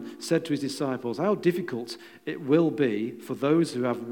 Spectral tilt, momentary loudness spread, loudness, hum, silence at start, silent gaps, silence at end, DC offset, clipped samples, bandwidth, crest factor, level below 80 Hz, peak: -6 dB/octave; 12 LU; -27 LUFS; none; 0 s; none; 0 s; under 0.1%; under 0.1%; 18 kHz; 18 dB; -84 dBFS; -10 dBFS